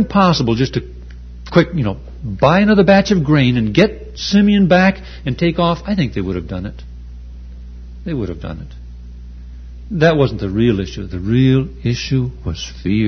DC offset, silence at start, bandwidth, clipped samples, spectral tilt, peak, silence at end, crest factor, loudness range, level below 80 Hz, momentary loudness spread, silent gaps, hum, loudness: under 0.1%; 0 s; 6.6 kHz; under 0.1%; -7 dB/octave; 0 dBFS; 0 s; 16 dB; 12 LU; -32 dBFS; 24 LU; none; 60 Hz at -30 dBFS; -16 LUFS